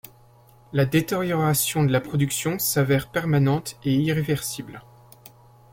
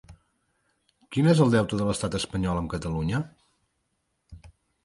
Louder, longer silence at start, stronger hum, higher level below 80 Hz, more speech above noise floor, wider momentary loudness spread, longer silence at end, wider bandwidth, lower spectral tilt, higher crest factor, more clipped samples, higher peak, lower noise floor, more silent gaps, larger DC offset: about the same, -23 LUFS vs -25 LUFS; first, 0.7 s vs 0.1 s; neither; second, -54 dBFS vs -46 dBFS; second, 30 dB vs 52 dB; second, 6 LU vs 11 LU; first, 0.95 s vs 0.35 s; first, 16.5 kHz vs 11.5 kHz; second, -5 dB/octave vs -6.5 dB/octave; about the same, 16 dB vs 20 dB; neither; about the same, -8 dBFS vs -8 dBFS; second, -53 dBFS vs -76 dBFS; neither; neither